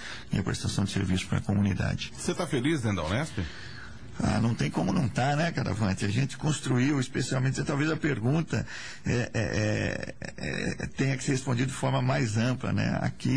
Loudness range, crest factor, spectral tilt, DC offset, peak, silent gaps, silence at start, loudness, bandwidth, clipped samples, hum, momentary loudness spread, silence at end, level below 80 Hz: 2 LU; 12 dB; -5.5 dB/octave; 0.6%; -16 dBFS; none; 0 s; -29 LUFS; 10.5 kHz; under 0.1%; none; 6 LU; 0 s; -48 dBFS